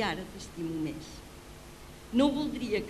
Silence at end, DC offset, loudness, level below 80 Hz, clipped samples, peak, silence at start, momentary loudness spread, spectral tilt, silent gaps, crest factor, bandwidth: 0 s; under 0.1%; -32 LUFS; -52 dBFS; under 0.1%; -14 dBFS; 0 s; 21 LU; -5 dB/octave; none; 20 dB; 14 kHz